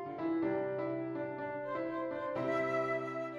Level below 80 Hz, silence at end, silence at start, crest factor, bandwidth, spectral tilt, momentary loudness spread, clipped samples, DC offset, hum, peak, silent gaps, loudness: -74 dBFS; 0 s; 0 s; 14 dB; 7.6 kHz; -7.5 dB/octave; 6 LU; under 0.1%; under 0.1%; none; -22 dBFS; none; -36 LUFS